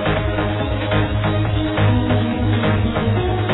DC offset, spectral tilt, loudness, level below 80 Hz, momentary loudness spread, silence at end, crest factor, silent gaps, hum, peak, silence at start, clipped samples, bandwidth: under 0.1%; -10.5 dB/octave; -19 LUFS; -28 dBFS; 3 LU; 0 s; 14 dB; none; none; -4 dBFS; 0 s; under 0.1%; 4.1 kHz